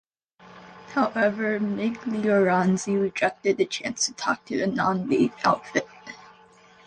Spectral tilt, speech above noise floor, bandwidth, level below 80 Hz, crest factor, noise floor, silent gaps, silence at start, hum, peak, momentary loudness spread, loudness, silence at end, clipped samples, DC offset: -4.5 dB/octave; 30 dB; 10 kHz; -64 dBFS; 18 dB; -53 dBFS; none; 0.5 s; none; -8 dBFS; 8 LU; -24 LUFS; 0.6 s; under 0.1%; under 0.1%